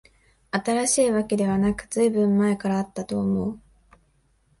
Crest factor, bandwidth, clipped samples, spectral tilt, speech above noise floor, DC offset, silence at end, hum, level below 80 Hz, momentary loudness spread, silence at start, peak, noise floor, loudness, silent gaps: 14 dB; 11.5 kHz; under 0.1%; -5 dB/octave; 42 dB; under 0.1%; 1 s; none; -52 dBFS; 9 LU; 0.55 s; -10 dBFS; -64 dBFS; -23 LUFS; none